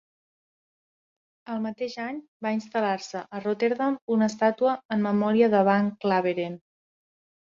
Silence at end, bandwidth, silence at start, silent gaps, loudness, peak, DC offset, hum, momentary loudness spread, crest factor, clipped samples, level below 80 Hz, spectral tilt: 0.9 s; 7.6 kHz; 1.5 s; 2.28-2.40 s, 4.02-4.08 s, 4.85-4.89 s; -26 LUFS; -8 dBFS; under 0.1%; none; 13 LU; 18 dB; under 0.1%; -72 dBFS; -6.5 dB/octave